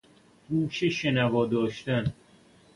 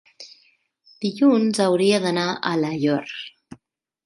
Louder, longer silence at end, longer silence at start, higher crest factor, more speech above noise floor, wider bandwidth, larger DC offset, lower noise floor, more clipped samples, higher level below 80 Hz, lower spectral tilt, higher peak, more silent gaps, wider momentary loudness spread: second, -27 LUFS vs -21 LUFS; about the same, 0.65 s vs 0.75 s; first, 0.5 s vs 0.2 s; about the same, 16 dB vs 18 dB; second, 31 dB vs 46 dB; about the same, 11.5 kHz vs 11.5 kHz; neither; second, -57 dBFS vs -66 dBFS; neither; first, -56 dBFS vs -70 dBFS; about the same, -6.5 dB/octave vs -5.5 dB/octave; second, -14 dBFS vs -6 dBFS; neither; second, 5 LU vs 21 LU